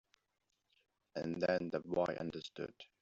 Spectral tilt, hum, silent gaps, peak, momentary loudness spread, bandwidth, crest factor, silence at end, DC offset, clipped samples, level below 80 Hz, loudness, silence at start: -4.5 dB/octave; none; none; -22 dBFS; 12 LU; 7.6 kHz; 20 dB; 0.15 s; under 0.1%; under 0.1%; -74 dBFS; -40 LUFS; 1.15 s